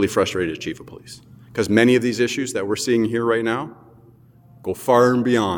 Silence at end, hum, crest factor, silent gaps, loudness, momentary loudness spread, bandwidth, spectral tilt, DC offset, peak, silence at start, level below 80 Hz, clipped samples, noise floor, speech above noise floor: 0 s; none; 20 dB; none; -20 LUFS; 19 LU; 19 kHz; -5 dB/octave; under 0.1%; -2 dBFS; 0 s; -56 dBFS; under 0.1%; -50 dBFS; 30 dB